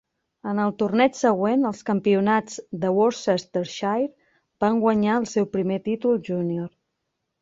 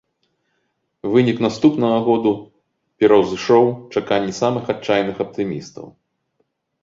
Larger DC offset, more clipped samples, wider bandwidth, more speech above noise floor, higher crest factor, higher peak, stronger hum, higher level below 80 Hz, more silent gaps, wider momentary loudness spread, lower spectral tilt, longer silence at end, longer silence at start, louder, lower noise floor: neither; neither; about the same, 7.8 kHz vs 7.6 kHz; about the same, 56 dB vs 53 dB; about the same, 18 dB vs 16 dB; second, -6 dBFS vs -2 dBFS; neither; second, -64 dBFS vs -58 dBFS; neither; second, 9 LU vs 12 LU; about the same, -6 dB/octave vs -6.5 dB/octave; second, 0.75 s vs 0.9 s; second, 0.45 s vs 1.05 s; second, -23 LUFS vs -18 LUFS; first, -79 dBFS vs -70 dBFS